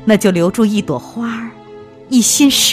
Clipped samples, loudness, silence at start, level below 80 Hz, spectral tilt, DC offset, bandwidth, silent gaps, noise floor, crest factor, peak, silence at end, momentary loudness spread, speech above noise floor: under 0.1%; -13 LUFS; 0 s; -48 dBFS; -3.5 dB/octave; under 0.1%; 15.5 kHz; none; -36 dBFS; 14 dB; 0 dBFS; 0 s; 13 LU; 23 dB